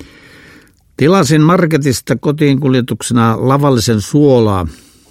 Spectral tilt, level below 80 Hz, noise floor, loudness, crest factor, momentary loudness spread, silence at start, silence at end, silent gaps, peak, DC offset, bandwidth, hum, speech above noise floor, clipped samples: -6 dB/octave; -40 dBFS; -44 dBFS; -12 LUFS; 12 dB; 6 LU; 0 s; 0.35 s; none; 0 dBFS; under 0.1%; 16 kHz; none; 33 dB; under 0.1%